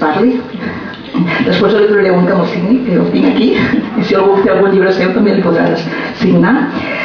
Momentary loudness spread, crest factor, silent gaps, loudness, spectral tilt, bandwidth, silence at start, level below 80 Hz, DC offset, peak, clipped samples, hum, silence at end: 8 LU; 10 dB; none; -11 LUFS; -8 dB/octave; 5.4 kHz; 0 s; -44 dBFS; under 0.1%; 0 dBFS; under 0.1%; none; 0 s